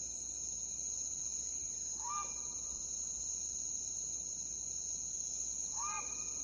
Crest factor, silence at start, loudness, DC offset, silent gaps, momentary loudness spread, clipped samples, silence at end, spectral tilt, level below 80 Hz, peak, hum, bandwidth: 14 dB; 0 s; -38 LUFS; under 0.1%; none; 2 LU; under 0.1%; 0 s; 0.5 dB/octave; -62 dBFS; -26 dBFS; none; 11.5 kHz